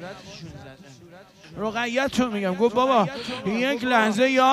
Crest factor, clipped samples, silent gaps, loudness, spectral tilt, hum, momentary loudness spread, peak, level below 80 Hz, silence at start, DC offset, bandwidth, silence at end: 16 dB; under 0.1%; none; -23 LUFS; -4.5 dB/octave; none; 20 LU; -8 dBFS; -58 dBFS; 0 s; under 0.1%; 15.5 kHz; 0 s